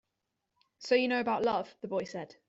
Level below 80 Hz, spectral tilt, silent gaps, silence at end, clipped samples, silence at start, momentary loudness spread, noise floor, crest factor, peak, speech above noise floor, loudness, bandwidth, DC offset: -74 dBFS; -5 dB/octave; none; 0.15 s; under 0.1%; 0.8 s; 11 LU; -85 dBFS; 20 dB; -14 dBFS; 53 dB; -31 LUFS; 8 kHz; under 0.1%